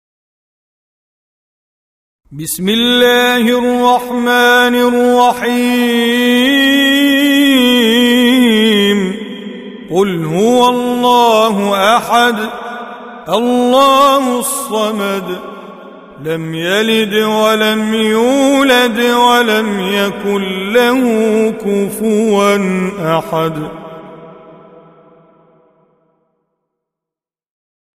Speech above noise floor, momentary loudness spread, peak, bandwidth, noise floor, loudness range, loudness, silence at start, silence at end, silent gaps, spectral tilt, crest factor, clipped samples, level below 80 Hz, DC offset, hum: 75 dB; 13 LU; 0 dBFS; 16 kHz; -86 dBFS; 6 LU; -11 LUFS; 2.3 s; 3.6 s; none; -4 dB/octave; 12 dB; under 0.1%; -52 dBFS; under 0.1%; none